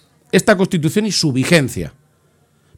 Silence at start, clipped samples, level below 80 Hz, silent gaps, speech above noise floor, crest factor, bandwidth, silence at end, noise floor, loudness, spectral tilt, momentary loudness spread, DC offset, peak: 0.35 s; under 0.1%; -48 dBFS; none; 42 dB; 18 dB; 17.5 kHz; 0.85 s; -57 dBFS; -15 LUFS; -4.5 dB/octave; 11 LU; under 0.1%; 0 dBFS